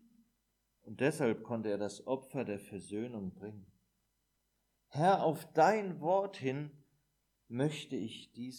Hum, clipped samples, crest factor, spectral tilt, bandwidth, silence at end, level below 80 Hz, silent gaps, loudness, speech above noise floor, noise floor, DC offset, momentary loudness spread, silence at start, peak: none; under 0.1%; 20 dB; -6 dB/octave; 18.5 kHz; 0 s; -80 dBFS; none; -35 LUFS; 46 dB; -81 dBFS; under 0.1%; 16 LU; 0.85 s; -16 dBFS